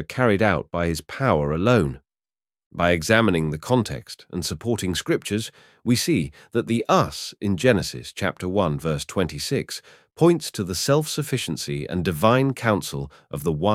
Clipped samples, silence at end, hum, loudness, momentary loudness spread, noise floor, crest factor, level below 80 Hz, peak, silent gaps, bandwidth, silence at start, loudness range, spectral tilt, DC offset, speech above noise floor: under 0.1%; 0 s; none; -23 LUFS; 10 LU; under -90 dBFS; 20 dB; -46 dBFS; -2 dBFS; 2.66-2.71 s; 16.5 kHz; 0 s; 2 LU; -5 dB/octave; under 0.1%; over 68 dB